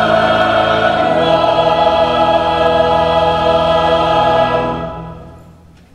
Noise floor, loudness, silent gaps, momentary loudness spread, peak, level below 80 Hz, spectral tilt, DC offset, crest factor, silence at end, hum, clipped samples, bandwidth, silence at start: -41 dBFS; -12 LUFS; none; 5 LU; 0 dBFS; -36 dBFS; -6 dB/octave; under 0.1%; 12 dB; 0.55 s; none; under 0.1%; 10.5 kHz; 0 s